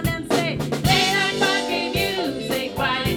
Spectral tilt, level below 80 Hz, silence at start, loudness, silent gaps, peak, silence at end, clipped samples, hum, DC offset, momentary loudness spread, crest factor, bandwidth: -4 dB/octave; -40 dBFS; 0 s; -21 LUFS; none; -4 dBFS; 0 s; under 0.1%; none; under 0.1%; 7 LU; 16 dB; 19.5 kHz